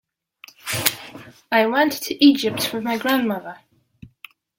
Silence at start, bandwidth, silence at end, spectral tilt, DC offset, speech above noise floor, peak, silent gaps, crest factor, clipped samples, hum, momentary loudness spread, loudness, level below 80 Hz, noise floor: 0.65 s; 17 kHz; 0.5 s; -3.5 dB/octave; under 0.1%; 30 dB; 0 dBFS; none; 22 dB; under 0.1%; none; 19 LU; -20 LUFS; -62 dBFS; -49 dBFS